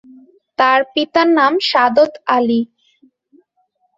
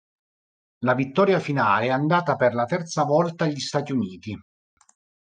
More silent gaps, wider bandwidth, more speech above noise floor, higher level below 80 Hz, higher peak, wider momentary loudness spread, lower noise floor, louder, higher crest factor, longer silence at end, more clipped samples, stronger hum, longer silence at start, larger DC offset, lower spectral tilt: neither; second, 7.8 kHz vs 9.6 kHz; second, 50 dB vs over 68 dB; about the same, -64 dBFS vs -68 dBFS; first, 0 dBFS vs -6 dBFS; about the same, 7 LU vs 8 LU; second, -64 dBFS vs under -90 dBFS; first, -14 LUFS vs -23 LUFS; about the same, 16 dB vs 18 dB; first, 1.3 s vs 0.85 s; neither; neither; second, 0.6 s vs 0.8 s; neither; second, -4.5 dB/octave vs -6 dB/octave